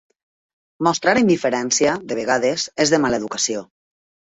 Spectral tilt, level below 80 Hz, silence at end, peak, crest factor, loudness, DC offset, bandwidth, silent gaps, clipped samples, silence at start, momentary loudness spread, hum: -3 dB/octave; -56 dBFS; 0.7 s; -2 dBFS; 18 dB; -19 LUFS; under 0.1%; 8.4 kHz; none; under 0.1%; 0.8 s; 6 LU; none